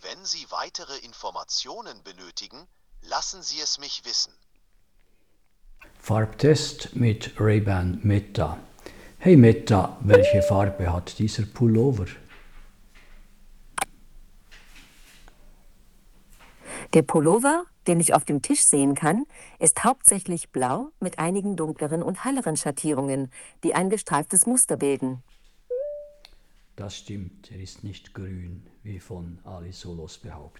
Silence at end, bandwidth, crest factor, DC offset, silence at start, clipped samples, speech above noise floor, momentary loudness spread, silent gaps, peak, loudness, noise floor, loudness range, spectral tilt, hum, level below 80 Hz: 0.1 s; 14 kHz; 24 dB; under 0.1%; 0.05 s; under 0.1%; 41 dB; 22 LU; none; 0 dBFS; -22 LUFS; -65 dBFS; 19 LU; -4.5 dB/octave; none; -48 dBFS